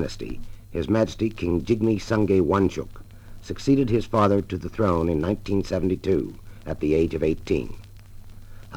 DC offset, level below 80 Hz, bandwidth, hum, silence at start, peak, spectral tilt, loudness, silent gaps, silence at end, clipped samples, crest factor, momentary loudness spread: under 0.1%; -40 dBFS; 18 kHz; none; 0 s; -6 dBFS; -7.5 dB/octave; -24 LUFS; none; 0 s; under 0.1%; 18 dB; 15 LU